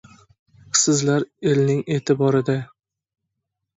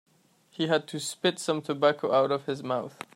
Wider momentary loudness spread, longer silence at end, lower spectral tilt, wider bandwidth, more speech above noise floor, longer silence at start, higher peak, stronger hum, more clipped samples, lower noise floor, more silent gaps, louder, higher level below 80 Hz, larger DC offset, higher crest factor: about the same, 7 LU vs 8 LU; first, 1.15 s vs 0.1 s; about the same, -4.5 dB/octave vs -4.5 dB/octave; second, 8.2 kHz vs 16 kHz; first, 61 dB vs 34 dB; first, 0.75 s vs 0.6 s; first, -2 dBFS vs -10 dBFS; neither; neither; first, -80 dBFS vs -62 dBFS; neither; first, -20 LUFS vs -28 LUFS; first, -62 dBFS vs -78 dBFS; neither; about the same, 20 dB vs 20 dB